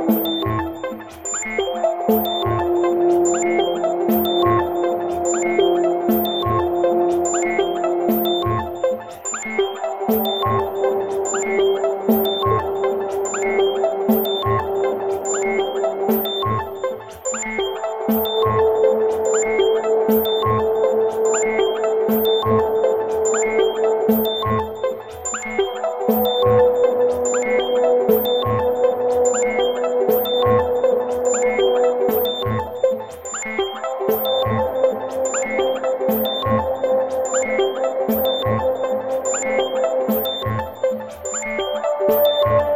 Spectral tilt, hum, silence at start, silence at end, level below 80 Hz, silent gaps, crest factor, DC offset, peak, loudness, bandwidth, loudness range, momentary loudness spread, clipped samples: -4.5 dB/octave; none; 0 s; 0 s; -50 dBFS; none; 16 dB; under 0.1%; -4 dBFS; -19 LUFS; 15.5 kHz; 3 LU; 6 LU; under 0.1%